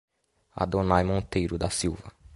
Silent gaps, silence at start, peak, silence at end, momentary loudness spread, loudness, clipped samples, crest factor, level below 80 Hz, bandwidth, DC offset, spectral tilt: none; 0.55 s; -6 dBFS; 0 s; 11 LU; -27 LUFS; under 0.1%; 22 dB; -42 dBFS; 11.5 kHz; under 0.1%; -5.5 dB/octave